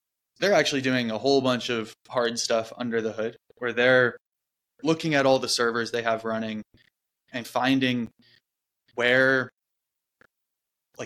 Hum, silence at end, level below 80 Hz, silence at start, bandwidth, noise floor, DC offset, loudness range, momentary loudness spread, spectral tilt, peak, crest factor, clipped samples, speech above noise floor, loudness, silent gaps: none; 0 s; -68 dBFS; 0.4 s; 14.5 kHz; -86 dBFS; under 0.1%; 3 LU; 13 LU; -4 dB/octave; -6 dBFS; 20 dB; under 0.1%; 61 dB; -24 LUFS; 4.21-4.25 s, 9.53-9.57 s